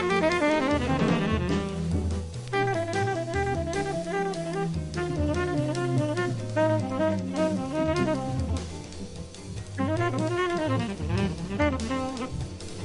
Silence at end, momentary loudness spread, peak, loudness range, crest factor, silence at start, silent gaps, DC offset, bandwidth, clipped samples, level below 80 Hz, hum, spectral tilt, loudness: 0 s; 9 LU; -12 dBFS; 2 LU; 16 dB; 0 s; none; under 0.1%; 11.5 kHz; under 0.1%; -42 dBFS; none; -6.5 dB/octave; -28 LUFS